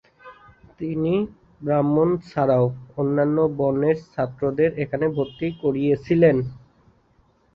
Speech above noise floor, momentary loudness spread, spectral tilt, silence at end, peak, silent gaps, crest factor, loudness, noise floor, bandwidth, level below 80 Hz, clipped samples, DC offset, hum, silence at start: 39 dB; 9 LU; -10 dB/octave; 0.95 s; -6 dBFS; none; 18 dB; -22 LUFS; -61 dBFS; 6.2 kHz; -54 dBFS; under 0.1%; under 0.1%; none; 0.25 s